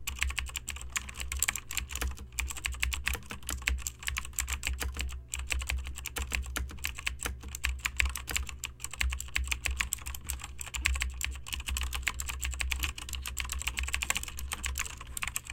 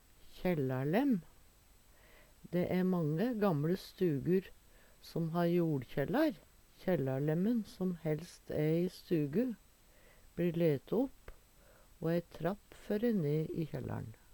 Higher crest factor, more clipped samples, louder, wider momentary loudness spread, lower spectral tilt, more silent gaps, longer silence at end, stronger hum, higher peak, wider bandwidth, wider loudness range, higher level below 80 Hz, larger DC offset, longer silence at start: first, 28 dB vs 18 dB; neither; about the same, -34 LUFS vs -35 LUFS; about the same, 7 LU vs 8 LU; second, -1.5 dB/octave vs -8 dB/octave; neither; second, 0 s vs 0.2 s; neither; first, -6 dBFS vs -18 dBFS; second, 17 kHz vs 19 kHz; about the same, 2 LU vs 3 LU; first, -38 dBFS vs -62 dBFS; neither; second, 0 s vs 0.25 s